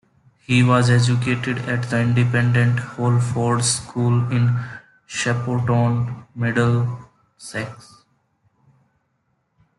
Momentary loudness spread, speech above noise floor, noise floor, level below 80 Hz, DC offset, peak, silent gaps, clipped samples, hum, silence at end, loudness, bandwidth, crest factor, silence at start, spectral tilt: 13 LU; 50 dB; -69 dBFS; -54 dBFS; under 0.1%; -4 dBFS; none; under 0.1%; none; 2.05 s; -20 LUFS; 11.5 kHz; 16 dB; 0.5 s; -5.5 dB/octave